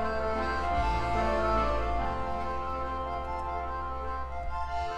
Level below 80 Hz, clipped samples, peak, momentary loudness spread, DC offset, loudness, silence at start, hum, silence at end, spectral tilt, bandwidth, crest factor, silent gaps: -38 dBFS; under 0.1%; -16 dBFS; 8 LU; under 0.1%; -32 LUFS; 0 s; none; 0 s; -6.5 dB/octave; 9.6 kHz; 16 dB; none